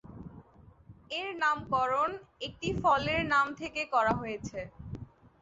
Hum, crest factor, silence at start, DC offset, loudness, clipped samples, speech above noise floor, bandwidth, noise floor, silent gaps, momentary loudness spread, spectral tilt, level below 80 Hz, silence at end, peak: none; 18 dB; 0.05 s; under 0.1%; -30 LUFS; under 0.1%; 26 dB; 8 kHz; -57 dBFS; none; 18 LU; -3 dB/octave; -54 dBFS; 0.35 s; -14 dBFS